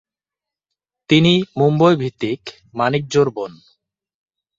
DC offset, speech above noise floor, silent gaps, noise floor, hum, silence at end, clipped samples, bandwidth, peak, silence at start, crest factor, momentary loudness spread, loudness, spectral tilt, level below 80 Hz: under 0.1%; 71 dB; none; -88 dBFS; none; 1.05 s; under 0.1%; 7.8 kHz; -2 dBFS; 1.1 s; 18 dB; 16 LU; -17 LUFS; -6.5 dB/octave; -56 dBFS